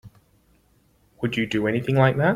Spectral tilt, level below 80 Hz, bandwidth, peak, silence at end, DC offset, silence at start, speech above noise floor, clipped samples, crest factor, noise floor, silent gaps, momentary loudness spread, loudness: -7.5 dB/octave; -54 dBFS; 11 kHz; -6 dBFS; 0 s; under 0.1%; 0.05 s; 40 dB; under 0.1%; 18 dB; -61 dBFS; none; 8 LU; -22 LUFS